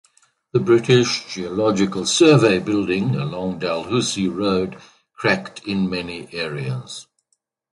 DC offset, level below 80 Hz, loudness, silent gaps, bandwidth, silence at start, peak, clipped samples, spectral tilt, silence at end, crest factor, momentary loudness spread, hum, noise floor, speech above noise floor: under 0.1%; -54 dBFS; -20 LUFS; none; 11.5 kHz; 0.55 s; -2 dBFS; under 0.1%; -5 dB/octave; 0.7 s; 20 dB; 13 LU; none; -71 dBFS; 52 dB